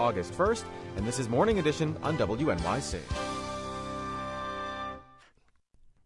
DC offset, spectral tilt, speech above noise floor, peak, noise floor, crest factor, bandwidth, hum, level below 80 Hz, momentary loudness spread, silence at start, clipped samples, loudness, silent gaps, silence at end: under 0.1%; -5.5 dB/octave; 35 dB; -12 dBFS; -65 dBFS; 20 dB; 11.5 kHz; none; -48 dBFS; 10 LU; 0 s; under 0.1%; -31 LUFS; none; 0.15 s